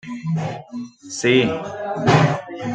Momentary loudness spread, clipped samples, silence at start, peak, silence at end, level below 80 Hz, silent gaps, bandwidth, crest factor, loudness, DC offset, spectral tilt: 16 LU; under 0.1%; 0.05 s; -2 dBFS; 0 s; -56 dBFS; none; 9.2 kHz; 18 dB; -20 LUFS; under 0.1%; -5.5 dB/octave